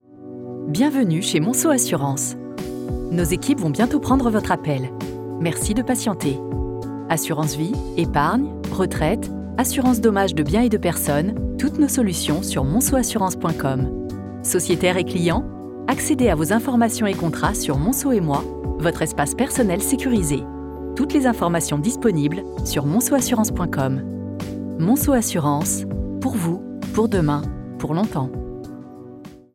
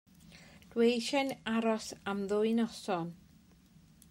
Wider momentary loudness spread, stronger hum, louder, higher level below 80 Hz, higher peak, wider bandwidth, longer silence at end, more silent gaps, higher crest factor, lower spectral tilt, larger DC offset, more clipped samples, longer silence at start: first, 11 LU vs 8 LU; neither; first, -21 LUFS vs -33 LUFS; first, -36 dBFS vs -70 dBFS; first, -6 dBFS vs -18 dBFS; about the same, 17 kHz vs 16 kHz; second, 0.15 s vs 0.95 s; neither; about the same, 16 dB vs 18 dB; about the same, -5 dB/octave vs -4.5 dB/octave; neither; neither; second, 0.1 s vs 0.25 s